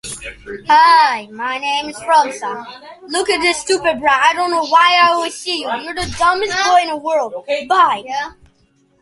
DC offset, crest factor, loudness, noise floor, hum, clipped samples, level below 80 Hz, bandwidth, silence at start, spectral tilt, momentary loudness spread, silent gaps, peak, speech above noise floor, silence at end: under 0.1%; 16 dB; -15 LUFS; -57 dBFS; none; under 0.1%; -48 dBFS; 11.5 kHz; 0.05 s; -2 dB/octave; 15 LU; none; 0 dBFS; 42 dB; 0.7 s